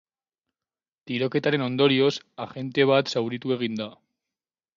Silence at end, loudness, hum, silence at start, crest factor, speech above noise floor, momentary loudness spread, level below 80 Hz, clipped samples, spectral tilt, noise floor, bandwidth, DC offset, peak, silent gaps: 0.85 s; -24 LUFS; none; 1.05 s; 20 dB; over 66 dB; 14 LU; -72 dBFS; under 0.1%; -6 dB/octave; under -90 dBFS; 7.6 kHz; under 0.1%; -6 dBFS; none